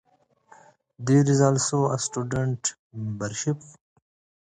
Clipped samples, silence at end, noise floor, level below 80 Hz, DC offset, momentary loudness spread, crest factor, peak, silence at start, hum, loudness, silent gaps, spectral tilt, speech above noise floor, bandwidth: under 0.1%; 0.8 s; -58 dBFS; -58 dBFS; under 0.1%; 14 LU; 20 dB; -6 dBFS; 1 s; none; -25 LUFS; 2.79-2.90 s; -5.5 dB/octave; 35 dB; 9.6 kHz